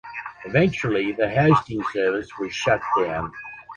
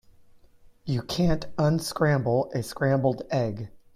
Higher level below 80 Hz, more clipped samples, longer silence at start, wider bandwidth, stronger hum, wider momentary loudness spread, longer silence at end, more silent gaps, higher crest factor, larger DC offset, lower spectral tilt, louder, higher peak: about the same, -50 dBFS vs -46 dBFS; neither; second, 0.05 s vs 0.85 s; second, 10 kHz vs 15.5 kHz; neither; first, 14 LU vs 8 LU; second, 0 s vs 0.2 s; neither; about the same, 18 dB vs 16 dB; neither; about the same, -6.5 dB/octave vs -6.5 dB/octave; first, -22 LUFS vs -26 LUFS; first, -6 dBFS vs -10 dBFS